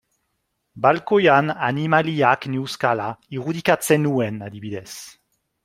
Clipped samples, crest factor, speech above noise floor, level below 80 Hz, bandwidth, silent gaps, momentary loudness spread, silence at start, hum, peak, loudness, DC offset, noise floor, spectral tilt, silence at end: under 0.1%; 20 dB; 54 dB; -62 dBFS; 16 kHz; none; 15 LU; 0.75 s; none; 0 dBFS; -20 LUFS; under 0.1%; -74 dBFS; -5.5 dB/octave; 0.55 s